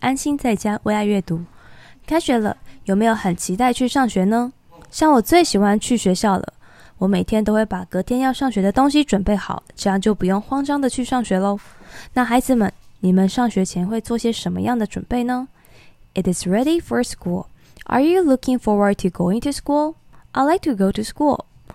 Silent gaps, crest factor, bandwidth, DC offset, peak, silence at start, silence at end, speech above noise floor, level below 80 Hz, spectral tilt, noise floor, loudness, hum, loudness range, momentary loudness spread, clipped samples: none; 18 dB; 15 kHz; under 0.1%; 0 dBFS; 0 s; 0.35 s; 29 dB; -42 dBFS; -5.5 dB/octave; -47 dBFS; -19 LUFS; none; 4 LU; 9 LU; under 0.1%